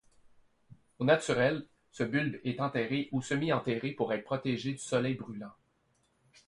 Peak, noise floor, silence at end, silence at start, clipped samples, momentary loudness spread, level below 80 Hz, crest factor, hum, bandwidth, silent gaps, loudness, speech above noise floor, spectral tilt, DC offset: -12 dBFS; -73 dBFS; 0.95 s; 1 s; under 0.1%; 11 LU; -68 dBFS; 20 dB; none; 11.5 kHz; none; -32 LUFS; 41 dB; -5.5 dB/octave; under 0.1%